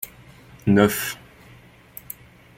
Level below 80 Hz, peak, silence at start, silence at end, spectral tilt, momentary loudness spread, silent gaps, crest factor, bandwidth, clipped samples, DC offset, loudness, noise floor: -56 dBFS; -4 dBFS; 0 s; 1.45 s; -5.5 dB/octave; 23 LU; none; 22 dB; 16.5 kHz; under 0.1%; under 0.1%; -21 LUFS; -49 dBFS